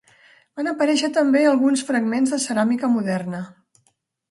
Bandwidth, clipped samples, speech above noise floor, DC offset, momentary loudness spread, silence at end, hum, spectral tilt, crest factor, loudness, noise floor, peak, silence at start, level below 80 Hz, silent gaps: 11.5 kHz; under 0.1%; 48 dB; under 0.1%; 13 LU; 0.8 s; none; -4.5 dB/octave; 14 dB; -20 LUFS; -67 dBFS; -8 dBFS; 0.55 s; -72 dBFS; none